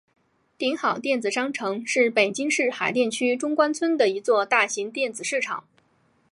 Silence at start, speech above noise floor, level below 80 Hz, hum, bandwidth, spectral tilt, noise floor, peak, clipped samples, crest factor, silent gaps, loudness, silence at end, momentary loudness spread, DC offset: 0.6 s; 41 dB; -78 dBFS; none; 11.5 kHz; -2.5 dB/octave; -65 dBFS; -4 dBFS; under 0.1%; 20 dB; none; -23 LUFS; 0.7 s; 7 LU; under 0.1%